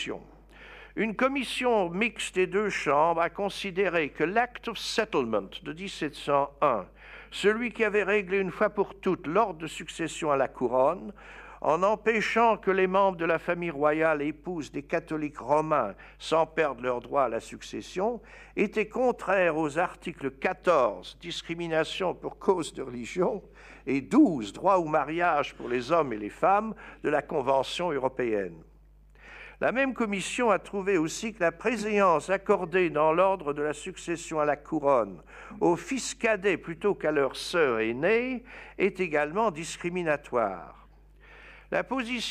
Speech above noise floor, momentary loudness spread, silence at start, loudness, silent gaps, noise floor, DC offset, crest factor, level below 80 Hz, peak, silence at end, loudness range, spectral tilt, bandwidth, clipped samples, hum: 28 dB; 12 LU; 0 s; -28 LUFS; none; -55 dBFS; under 0.1%; 18 dB; -56 dBFS; -10 dBFS; 0 s; 3 LU; -5 dB/octave; 14 kHz; under 0.1%; none